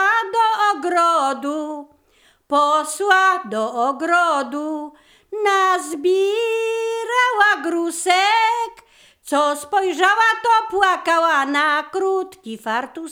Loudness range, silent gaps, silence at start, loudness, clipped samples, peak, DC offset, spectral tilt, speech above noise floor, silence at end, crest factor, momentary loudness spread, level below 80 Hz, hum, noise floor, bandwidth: 2 LU; none; 0 s; -18 LUFS; under 0.1%; -2 dBFS; under 0.1%; -1.5 dB/octave; 39 dB; 0 s; 18 dB; 10 LU; -66 dBFS; none; -57 dBFS; 19.5 kHz